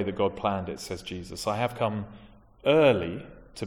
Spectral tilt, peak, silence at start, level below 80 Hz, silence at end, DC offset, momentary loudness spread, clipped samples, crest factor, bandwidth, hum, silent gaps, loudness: -5.5 dB/octave; -8 dBFS; 0 s; -54 dBFS; 0 s; under 0.1%; 16 LU; under 0.1%; 20 dB; 17 kHz; none; none; -27 LUFS